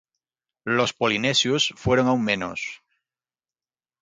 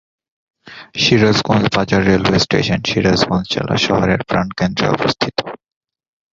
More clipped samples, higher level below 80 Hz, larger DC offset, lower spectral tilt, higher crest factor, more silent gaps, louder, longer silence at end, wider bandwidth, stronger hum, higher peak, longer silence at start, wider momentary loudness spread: neither; second, -54 dBFS vs -40 dBFS; neither; about the same, -4 dB/octave vs -5 dB/octave; about the same, 20 dB vs 16 dB; neither; second, -22 LUFS vs -15 LUFS; first, 1.25 s vs 0.75 s; first, 9.4 kHz vs 7.6 kHz; neither; second, -6 dBFS vs 0 dBFS; about the same, 0.65 s vs 0.65 s; first, 12 LU vs 6 LU